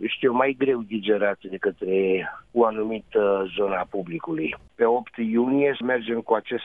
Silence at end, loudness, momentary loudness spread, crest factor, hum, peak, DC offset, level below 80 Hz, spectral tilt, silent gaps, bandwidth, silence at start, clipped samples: 0 s; -24 LUFS; 7 LU; 18 dB; none; -6 dBFS; under 0.1%; -62 dBFS; -8.5 dB/octave; none; 3.9 kHz; 0 s; under 0.1%